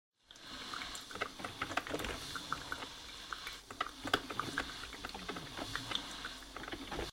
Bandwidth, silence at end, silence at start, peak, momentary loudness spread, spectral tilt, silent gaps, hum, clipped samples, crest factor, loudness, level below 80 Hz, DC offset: 16 kHz; 0 s; 0.3 s; -16 dBFS; 9 LU; -2.5 dB/octave; none; none; under 0.1%; 28 dB; -42 LUFS; -58 dBFS; under 0.1%